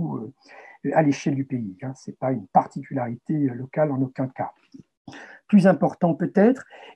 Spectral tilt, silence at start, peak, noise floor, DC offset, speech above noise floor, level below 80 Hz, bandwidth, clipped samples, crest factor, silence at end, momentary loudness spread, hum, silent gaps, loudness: -8 dB/octave; 0 s; -4 dBFS; -48 dBFS; under 0.1%; 25 dB; -72 dBFS; 9.2 kHz; under 0.1%; 20 dB; 0.05 s; 15 LU; none; 4.97-5.05 s; -23 LUFS